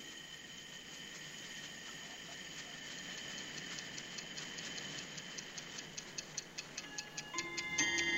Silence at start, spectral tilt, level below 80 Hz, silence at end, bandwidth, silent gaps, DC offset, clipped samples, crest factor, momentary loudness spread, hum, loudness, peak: 0 s; -1 dB/octave; -72 dBFS; 0 s; 16 kHz; none; under 0.1%; under 0.1%; 24 dB; 8 LU; none; -43 LUFS; -22 dBFS